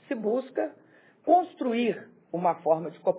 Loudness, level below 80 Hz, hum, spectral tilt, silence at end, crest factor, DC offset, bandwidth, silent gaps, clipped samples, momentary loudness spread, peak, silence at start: -28 LUFS; -84 dBFS; none; -10 dB/octave; 0 s; 18 dB; under 0.1%; 4 kHz; none; under 0.1%; 12 LU; -10 dBFS; 0.1 s